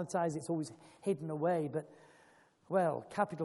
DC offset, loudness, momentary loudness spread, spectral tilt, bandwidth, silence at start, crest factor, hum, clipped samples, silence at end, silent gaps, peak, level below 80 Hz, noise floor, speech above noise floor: under 0.1%; -36 LUFS; 9 LU; -6.5 dB/octave; 11.5 kHz; 0 s; 18 dB; none; under 0.1%; 0 s; none; -18 dBFS; -80 dBFS; -66 dBFS; 30 dB